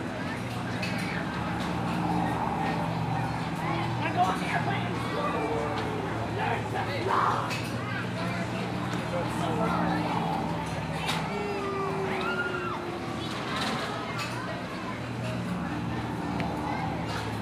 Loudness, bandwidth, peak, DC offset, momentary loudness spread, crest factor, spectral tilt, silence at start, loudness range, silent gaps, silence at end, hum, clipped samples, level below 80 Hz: -30 LUFS; 15.5 kHz; -12 dBFS; under 0.1%; 6 LU; 18 dB; -6 dB/octave; 0 s; 3 LU; none; 0 s; none; under 0.1%; -52 dBFS